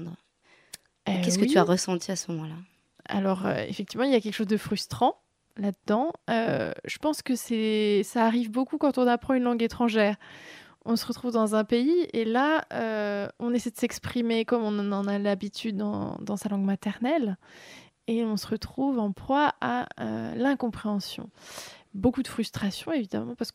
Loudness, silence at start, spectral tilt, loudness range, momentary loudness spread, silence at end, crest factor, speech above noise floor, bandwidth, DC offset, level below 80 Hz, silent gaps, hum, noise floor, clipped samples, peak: -27 LUFS; 0 s; -5 dB/octave; 4 LU; 14 LU; 0.05 s; 20 dB; 35 dB; 16 kHz; under 0.1%; -60 dBFS; none; none; -62 dBFS; under 0.1%; -8 dBFS